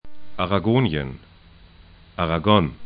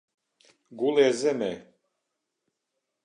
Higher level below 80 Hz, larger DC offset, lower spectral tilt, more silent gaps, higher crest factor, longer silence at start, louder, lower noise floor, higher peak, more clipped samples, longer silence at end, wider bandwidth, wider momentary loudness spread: first, -42 dBFS vs -76 dBFS; neither; first, -11.5 dB/octave vs -4.5 dB/octave; neither; about the same, 22 dB vs 20 dB; second, 0.05 s vs 0.7 s; first, -21 LUFS vs -25 LUFS; second, -49 dBFS vs -82 dBFS; first, 0 dBFS vs -10 dBFS; neither; second, 0 s vs 1.45 s; second, 5 kHz vs 10.5 kHz; first, 21 LU vs 11 LU